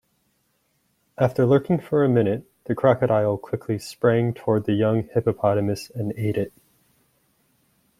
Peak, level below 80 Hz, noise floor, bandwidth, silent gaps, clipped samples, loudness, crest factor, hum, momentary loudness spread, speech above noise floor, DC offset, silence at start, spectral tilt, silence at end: -4 dBFS; -58 dBFS; -69 dBFS; 15 kHz; none; under 0.1%; -22 LUFS; 20 dB; none; 9 LU; 48 dB; under 0.1%; 1.2 s; -8 dB/octave; 1.5 s